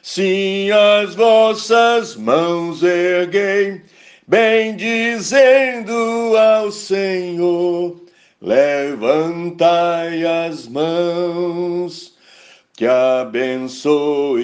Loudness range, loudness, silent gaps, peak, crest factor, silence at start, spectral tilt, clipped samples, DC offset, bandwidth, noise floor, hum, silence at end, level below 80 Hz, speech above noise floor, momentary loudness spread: 5 LU; -16 LUFS; none; 0 dBFS; 16 dB; 0.05 s; -4.5 dB/octave; under 0.1%; under 0.1%; 9.6 kHz; -46 dBFS; none; 0 s; -66 dBFS; 31 dB; 9 LU